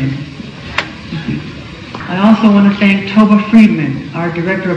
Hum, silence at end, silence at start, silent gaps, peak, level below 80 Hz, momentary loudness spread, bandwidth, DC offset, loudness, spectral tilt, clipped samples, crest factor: none; 0 s; 0 s; none; 0 dBFS; -42 dBFS; 19 LU; 8 kHz; under 0.1%; -11 LUFS; -7.5 dB/octave; 1%; 12 dB